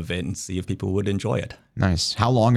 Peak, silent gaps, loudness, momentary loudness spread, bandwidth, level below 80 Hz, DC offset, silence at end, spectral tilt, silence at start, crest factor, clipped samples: -6 dBFS; none; -24 LUFS; 8 LU; 13.5 kHz; -42 dBFS; under 0.1%; 0 s; -5.5 dB/octave; 0 s; 16 dB; under 0.1%